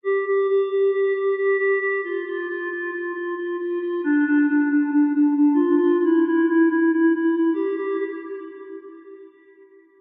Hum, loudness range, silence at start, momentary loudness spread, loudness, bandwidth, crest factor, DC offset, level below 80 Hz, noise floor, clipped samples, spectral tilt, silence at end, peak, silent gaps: none; 5 LU; 0.05 s; 10 LU; -21 LUFS; 3.7 kHz; 12 dB; under 0.1%; -88 dBFS; -51 dBFS; under 0.1%; -2.5 dB/octave; 0.7 s; -8 dBFS; none